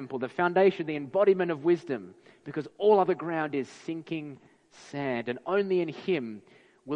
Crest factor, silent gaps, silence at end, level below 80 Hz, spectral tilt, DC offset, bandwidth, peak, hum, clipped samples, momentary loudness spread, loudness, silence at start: 18 dB; none; 0 s; -76 dBFS; -7 dB/octave; under 0.1%; 8.4 kHz; -10 dBFS; none; under 0.1%; 15 LU; -28 LUFS; 0 s